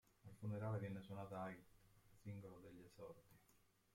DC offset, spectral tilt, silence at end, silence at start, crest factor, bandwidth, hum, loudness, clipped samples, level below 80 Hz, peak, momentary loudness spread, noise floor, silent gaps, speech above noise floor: under 0.1%; -8 dB/octave; 0.3 s; 0.25 s; 18 dB; 16.5 kHz; none; -53 LUFS; under 0.1%; -78 dBFS; -36 dBFS; 15 LU; -77 dBFS; none; 24 dB